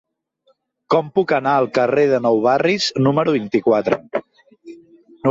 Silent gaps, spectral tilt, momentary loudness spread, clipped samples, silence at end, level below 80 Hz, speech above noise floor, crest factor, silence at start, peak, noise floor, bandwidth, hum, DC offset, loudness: none; -6 dB/octave; 6 LU; under 0.1%; 0 s; -60 dBFS; 46 dB; 14 dB; 0.9 s; -4 dBFS; -62 dBFS; 7.8 kHz; none; under 0.1%; -17 LUFS